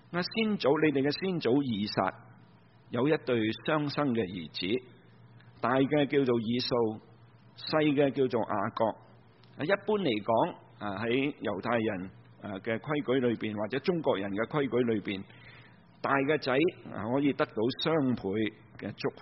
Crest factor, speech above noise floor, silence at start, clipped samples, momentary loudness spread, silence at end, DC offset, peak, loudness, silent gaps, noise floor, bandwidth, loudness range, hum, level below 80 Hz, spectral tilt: 20 dB; 29 dB; 0.1 s; under 0.1%; 11 LU; 0 s; under 0.1%; -12 dBFS; -30 LUFS; none; -58 dBFS; 5.8 kHz; 2 LU; none; -66 dBFS; -4.5 dB/octave